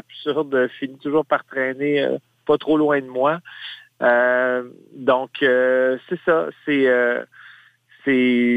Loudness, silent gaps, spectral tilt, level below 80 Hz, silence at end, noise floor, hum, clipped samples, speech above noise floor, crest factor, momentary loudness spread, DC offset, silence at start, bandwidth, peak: -20 LUFS; none; -7 dB/octave; -66 dBFS; 0 s; -52 dBFS; none; under 0.1%; 32 dB; 16 dB; 11 LU; under 0.1%; 0.15 s; 8.2 kHz; -4 dBFS